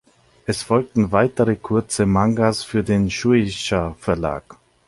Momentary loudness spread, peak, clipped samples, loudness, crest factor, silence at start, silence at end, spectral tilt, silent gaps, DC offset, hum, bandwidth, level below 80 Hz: 8 LU; -2 dBFS; under 0.1%; -20 LUFS; 18 dB; 0.5 s; 0.35 s; -6 dB/octave; none; under 0.1%; none; 11.5 kHz; -42 dBFS